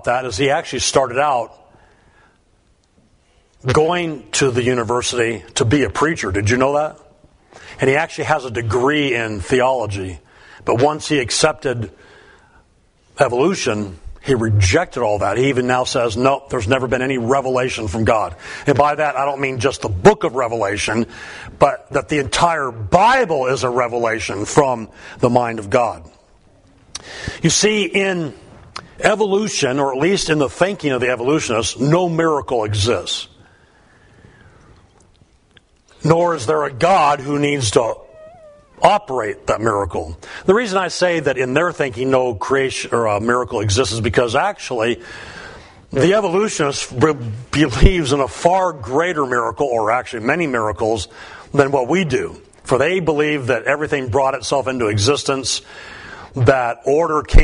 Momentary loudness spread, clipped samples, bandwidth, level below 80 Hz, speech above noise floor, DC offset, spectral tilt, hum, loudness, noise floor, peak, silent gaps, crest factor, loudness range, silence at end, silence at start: 10 LU; under 0.1%; 11 kHz; -32 dBFS; 40 dB; under 0.1%; -4.5 dB/octave; none; -17 LUFS; -57 dBFS; 0 dBFS; none; 18 dB; 3 LU; 0 s; 0.05 s